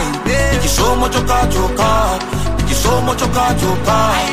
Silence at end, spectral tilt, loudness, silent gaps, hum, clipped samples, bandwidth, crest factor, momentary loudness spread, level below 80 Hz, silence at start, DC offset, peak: 0 s; -4.5 dB/octave; -15 LUFS; none; none; under 0.1%; 16 kHz; 12 dB; 3 LU; -22 dBFS; 0 s; 4%; -2 dBFS